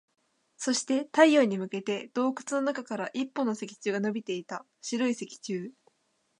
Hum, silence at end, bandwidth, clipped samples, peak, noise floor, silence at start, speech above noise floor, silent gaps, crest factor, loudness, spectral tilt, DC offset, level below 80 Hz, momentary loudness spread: none; 0.7 s; 11 kHz; under 0.1%; -6 dBFS; -74 dBFS; 0.6 s; 45 dB; none; 24 dB; -29 LUFS; -4 dB/octave; under 0.1%; -84 dBFS; 14 LU